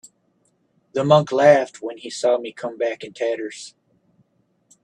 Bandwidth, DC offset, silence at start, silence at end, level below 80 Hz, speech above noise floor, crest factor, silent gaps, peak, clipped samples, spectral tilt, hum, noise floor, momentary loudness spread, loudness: 10 kHz; under 0.1%; 0.95 s; 1.15 s; -68 dBFS; 46 dB; 22 dB; none; 0 dBFS; under 0.1%; -5.5 dB/octave; none; -66 dBFS; 18 LU; -20 LUFS